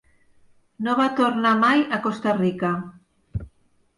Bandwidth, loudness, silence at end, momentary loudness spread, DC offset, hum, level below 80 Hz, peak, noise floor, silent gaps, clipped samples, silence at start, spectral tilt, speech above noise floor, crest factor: 11 kHz; -21 LUFS; 0.5 s; 17 LU; under 0.1%; none; -48 dBFS; -8 dBFS; -59 dBFS; none; under 0.1%; 0.8 s; -6.5 dB/octave; 39 dB; 14 dB